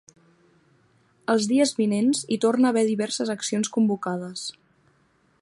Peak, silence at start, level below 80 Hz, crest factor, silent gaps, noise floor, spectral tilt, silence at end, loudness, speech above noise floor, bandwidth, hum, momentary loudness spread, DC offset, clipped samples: -8 dBFS; 1.3 s; -74 dBFS; 16 dB; none; -64 dBFS; -4.5 dB/octave; 0.9 s; -23 LUFS; 41 dB; 11.5 kHz; none; 11 LU; under 0.1%; under 0.1%